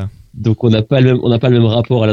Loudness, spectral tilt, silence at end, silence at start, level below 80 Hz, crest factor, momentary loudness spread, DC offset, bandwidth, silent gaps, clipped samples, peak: -13 LUFS; -9 dB/octave; 0 s; 0 s; -44 dBFS; 12 dB; 7 LU; under 0.1%; 6.2 kHz; none; under 0.1%; 0 dBFS